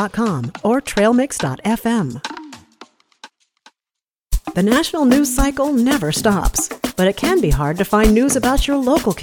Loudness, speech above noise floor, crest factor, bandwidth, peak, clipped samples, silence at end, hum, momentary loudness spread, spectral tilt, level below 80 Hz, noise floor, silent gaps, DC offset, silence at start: -17 LUFS; 70 dB; 16 dB; 19.5 kHz; 0 dBFS; under 0.1%; 0 s; none; 8 LU; -4.5 dB/octave; -28 dBFS; -86 dBFS; none; under 0.1%; 0 s